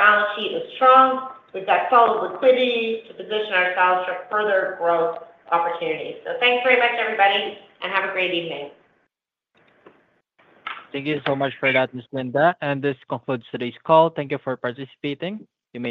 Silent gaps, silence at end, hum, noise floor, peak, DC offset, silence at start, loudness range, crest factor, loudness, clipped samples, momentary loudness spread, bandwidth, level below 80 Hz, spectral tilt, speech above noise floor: none; 0 s; none; -78 dBFS; -2 dBFS; under 0.1%; 0 s; 10 LU; 20 dB; -21 LUFS; under 0.1%; 15 LU; 5 kHz; -74 dBFS; -7 dB/octave; 57 dB